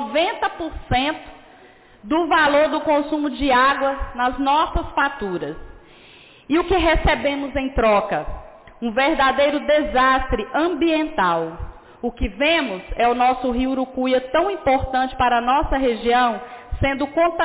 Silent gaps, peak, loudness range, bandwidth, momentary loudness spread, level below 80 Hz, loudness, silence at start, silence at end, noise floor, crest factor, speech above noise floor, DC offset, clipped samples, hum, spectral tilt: none; -8 dBFS; 2 LU; 4 kHz; 10 LU; -34 dBFS; -20 LUFS; 0 s; 0 s; -48 dBFS; 12 dB; 29 dB; under 0.1%; under 0.1%; none; -9 dB/octave